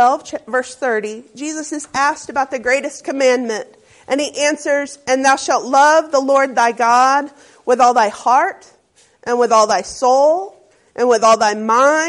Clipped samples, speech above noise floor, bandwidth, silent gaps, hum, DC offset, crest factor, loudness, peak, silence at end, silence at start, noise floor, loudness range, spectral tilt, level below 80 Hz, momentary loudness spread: under 0.1%; 36 dB; 11.5 kHz; none; none; under 0.1%; 14 dB; -15 LUFS; -2 dBFS; 0 s; 0 s; -51 dBFS; 5 LU; -2 dB/octave; -60 dBFS; 12 LU